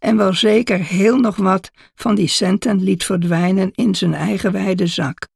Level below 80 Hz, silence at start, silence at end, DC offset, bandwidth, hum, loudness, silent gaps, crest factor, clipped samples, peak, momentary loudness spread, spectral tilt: -50 dBFS; 0 s; 0.1 s; under 0.1%; 12.5 kHz; none; -16 LUFS; none; 14 dB; under 0.1%; -2 dBFS; 5 LU; -5.5 dB/octave